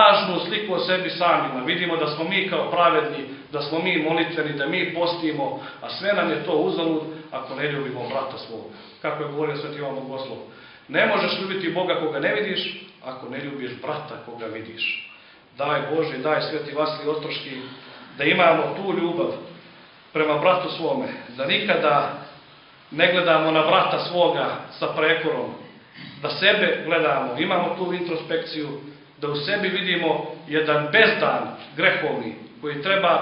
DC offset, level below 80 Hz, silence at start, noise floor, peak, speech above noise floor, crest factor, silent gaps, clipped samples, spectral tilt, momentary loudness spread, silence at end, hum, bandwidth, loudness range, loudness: under 0.1%; -70 dBFS; 0 s; -49 dBFS; 0 dBFS; 26 dB; 22 dB; none; under 0.1%; -9 dB/octave; 15 LU; 0 s; none; 5.6 kHz; 6 LU; -22 LUFS